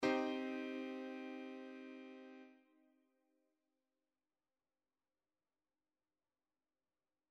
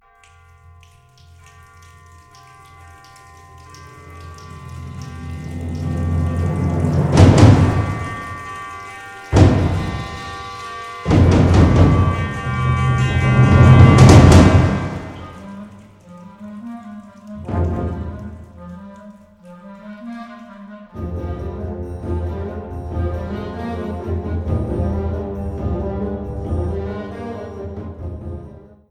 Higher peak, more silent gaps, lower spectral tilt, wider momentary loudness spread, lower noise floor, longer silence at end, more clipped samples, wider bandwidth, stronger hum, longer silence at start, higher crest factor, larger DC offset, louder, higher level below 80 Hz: second, -24 dBFS vs 0 dBFS; neither; second, -4.5 dB/octave vs -7.5 dB/octave; second, 18 LU vs 25 LU; first, under -90 dBFS vs -49 dBFS; first, 4.75 s vs 0.35 s; neither; second, 9.4 kHz vs 11 kHz; neither; second, 0 s vs 3.75 s; first, 24 dB vs 18 dB; neither; second, -46 LUFS vs -16 LUFS; second, under -90 dBFS vs -28 dBFS